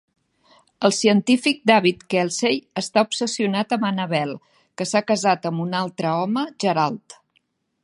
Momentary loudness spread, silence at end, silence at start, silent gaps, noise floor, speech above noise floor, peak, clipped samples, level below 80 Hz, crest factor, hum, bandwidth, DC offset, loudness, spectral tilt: 8 LU; 0.7 s; 0.8 s; none; -68 dBFS; 47 dB; -2 dBFS; under 0.1%; -70 dBFS; 20 dB; none; 11.5 kHz; under 0.1%; -21 LUFS; -4.5 dB/octave